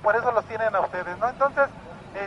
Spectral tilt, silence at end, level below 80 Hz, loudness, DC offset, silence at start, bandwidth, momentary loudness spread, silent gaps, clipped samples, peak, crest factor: -6 dB/octave; 0 s; -56 dBFS; -25 LUFS; under 0.1%; 0 s; 10.5 kHz; 8 LU; none; under 0.1%; -8 dBFS; 16 dB